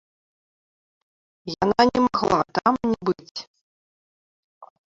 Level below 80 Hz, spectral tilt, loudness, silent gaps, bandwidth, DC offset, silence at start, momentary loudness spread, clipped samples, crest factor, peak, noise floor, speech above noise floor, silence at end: -54 dBFS; -5.5 dB/octave; -22 LUFS; 3.31-3.35 s, 3.47-3.54 s, 3.61-4.61 s; 7.8 kHz; under 0.1%; 1.45 s; 18 LU; under 0.1%; 22 dB; -4 dBFS; under -90 dBFS; over 68 dB; 0.25 s